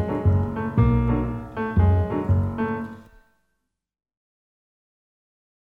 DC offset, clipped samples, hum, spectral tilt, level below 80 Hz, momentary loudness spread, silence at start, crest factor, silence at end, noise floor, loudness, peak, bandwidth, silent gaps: under 0.1%; under 0.1%; none; -10.5 dB/octave; -34 dBFS; 9 LU; 0 s; 18 dB; 2.7 s; -78 dBFS; -23 LUFS; -6 dBFS; 3.8 kHz; none